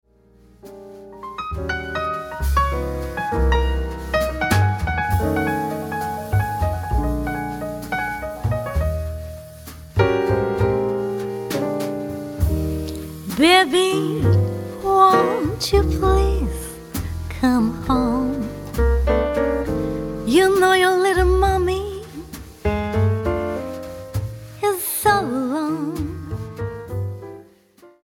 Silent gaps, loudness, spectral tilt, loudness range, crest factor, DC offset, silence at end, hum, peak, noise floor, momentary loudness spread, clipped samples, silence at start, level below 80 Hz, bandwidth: none; -21 LUFS; -5.5 dB/octave; 6 LU; 20 dB; under 0.1%; 0.15 s; none; -2 dBFS; -52 dBFS; 14 LU; under 0.1%; 0.65 s; -28 dBFS; 18 kHz